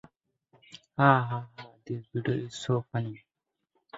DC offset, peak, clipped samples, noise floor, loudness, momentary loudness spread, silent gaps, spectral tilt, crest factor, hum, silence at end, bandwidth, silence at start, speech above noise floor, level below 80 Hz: under 0.1%; -4 dBFS; under 0.1%; -79 dBFS; -29 LUFS; 21 LU; none; -7 dB/octave; 26 dB; none; 0 s; 8 kHz; 0.75 s; 51 dB; -68 dBFS